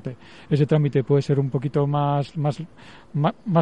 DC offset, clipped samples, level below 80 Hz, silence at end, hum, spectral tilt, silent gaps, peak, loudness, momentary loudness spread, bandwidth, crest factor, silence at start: 0.3%; under 0.1%; -58 dBFS; 0 s; none; -9 dB/octave; none; -8 dBFS; -22 LUFS; 15 LU; 8 kHz; 14 dB; 0.05 s